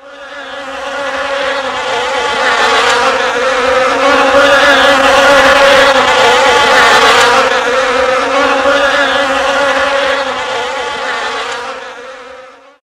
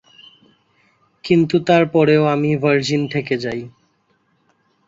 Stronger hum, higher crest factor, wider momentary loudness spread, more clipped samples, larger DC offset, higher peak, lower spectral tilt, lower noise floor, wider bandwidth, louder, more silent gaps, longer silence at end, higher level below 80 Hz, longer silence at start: neither; second, 10 dB vs 16 dB; about the same, 15 LU vs 13 LU; neither; neither; about the same, 0 dBFS vs -2 dBFS; second, -1.5 dB/octave vs -6.5 dB/octave; second, -35 dBFS vs -63 dBFS; first, 16 kHz vs 7.8 kHz; first, -9 LUFS vs -17 LUFS; neither; second, 0.35 s vs 1.2 s; first, -40 dBFS vs -58 dBFS; second, 0.05 s vs 1.25 s